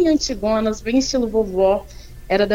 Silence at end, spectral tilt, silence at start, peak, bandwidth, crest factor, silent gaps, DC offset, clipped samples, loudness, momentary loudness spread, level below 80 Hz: 0 s; -4.5 dB/octave; 0 s; -4 dBFS; 16.5 kHz; 14 dB; none; under 0.1%; under 0.1%; -19 LUFS; 3 LU; -38 dBFS